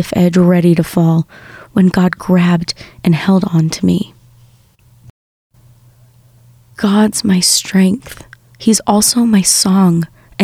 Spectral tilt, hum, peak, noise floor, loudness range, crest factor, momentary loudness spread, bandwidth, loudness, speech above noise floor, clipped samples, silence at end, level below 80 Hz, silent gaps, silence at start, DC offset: -5 dB/octave; none; 0 dBFS; -48 dBFS; 9 LU; 14 dB; 9 LU; 15.5 kHz; -12 LUFS; 36 dB; under 0.1%; 0 s; -46 dBFS; 5.10-5.50 s; 0 s; under 0.1%